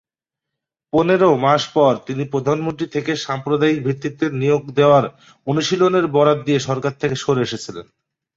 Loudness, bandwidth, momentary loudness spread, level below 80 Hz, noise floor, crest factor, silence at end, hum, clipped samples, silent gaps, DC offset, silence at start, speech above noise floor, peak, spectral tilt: -18 LUFS; 7.8 kHz; 9 LU; -56 dBFS; -85 dBFS; 16 dB; 0.55 s; none; under 0.1%; none; under 0.1%; 0.95 s; 67 dB; -2 dBFS; -6 dB/octave